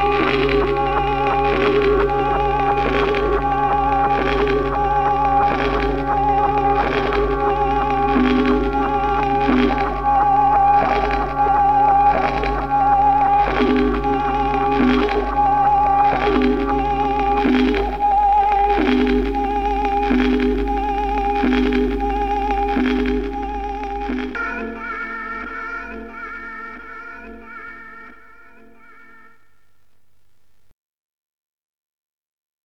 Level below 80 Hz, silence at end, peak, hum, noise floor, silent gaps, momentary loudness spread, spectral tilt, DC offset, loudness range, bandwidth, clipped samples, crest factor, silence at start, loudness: -30 dBFS; 4.55 s; -2 dBFS; none; -66 dBFS; none; 12 LU; -7 dB/octave; 0.6%; 12 LU; 6.8 kHz; under 0.1%; 16 dB; 0 s; -18 LUFS